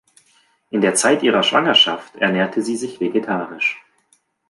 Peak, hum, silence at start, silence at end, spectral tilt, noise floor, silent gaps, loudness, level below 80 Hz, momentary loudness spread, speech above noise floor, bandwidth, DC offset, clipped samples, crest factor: -2 dBFS; none; 0.75 s; 0.7 s; -3 dB/octave; -62 dBFS; none; -17 LUFS; -68 dBFS; 11 LU; 44 dB; 11.5 kHz; under 0.1%; under 0.1%; 18 dB